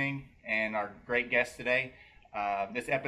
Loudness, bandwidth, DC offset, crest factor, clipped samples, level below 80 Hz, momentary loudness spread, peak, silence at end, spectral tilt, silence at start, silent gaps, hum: -32 LUFS; 13.5 kHz; under 0.1%; 20 dB; under 0.1%; -62 dBFS; 10 LU; -14 dBFS; 0 s; -5 dB/octave; 0 s; none; none